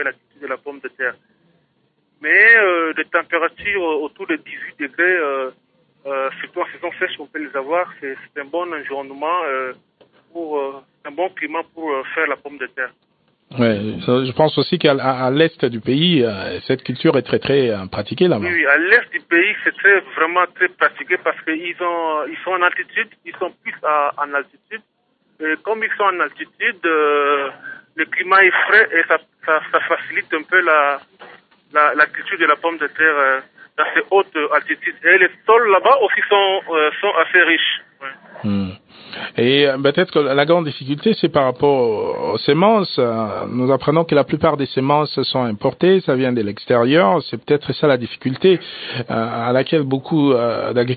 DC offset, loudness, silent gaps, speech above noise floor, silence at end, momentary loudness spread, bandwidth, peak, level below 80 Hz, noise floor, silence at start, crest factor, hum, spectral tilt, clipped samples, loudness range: under 0.1%; -17 LUFS; none; 46 dB; 0 s; 13 LU; 4.9 kHz; 0 dBFS; -60 dBFS; -64 dBFS; 0 s; 18 dB; none; -10.5 dB/octave; under 0.1%; 9 LU